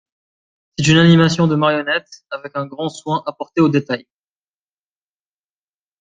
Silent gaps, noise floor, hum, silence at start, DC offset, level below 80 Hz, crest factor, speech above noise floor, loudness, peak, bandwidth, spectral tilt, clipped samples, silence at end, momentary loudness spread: none; under -90 dBFS; 50 Hz at -45 dBFS; 0.8 s; under 0.1%; -52 dBFS; 18 dB; over 74 dB; -16 LUFS; -2 dBFS; 9 kHz; -6 dB/octave; under 0.1%; 2 s; 15 LU